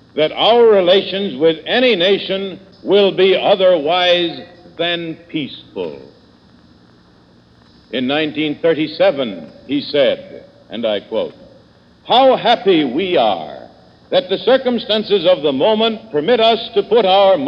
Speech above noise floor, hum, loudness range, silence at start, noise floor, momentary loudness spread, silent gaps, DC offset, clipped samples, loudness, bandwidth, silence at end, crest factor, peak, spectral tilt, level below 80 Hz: 34 dB; none; 10 LU; 0.15 s; -48 dBFS; 14 LU; none; under 0.1%; under 0.1%; -15 LUFS; 6.4 kHz; 0 s; 16 dB; 0 dBFS; -6.5 dB/octave; -58 dBFS